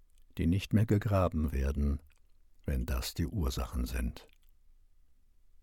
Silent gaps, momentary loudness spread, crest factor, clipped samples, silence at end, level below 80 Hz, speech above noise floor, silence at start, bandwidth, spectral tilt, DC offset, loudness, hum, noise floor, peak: none; 12 LU; 18 dB; under 0.1%; 1.4 s; -38 dBFS; 30 dB; 0.35 s; 17.5 kHz; -7 dB/octave; under 0.1%; -33 LUFS; none; -61 dBFS; -16 dBFS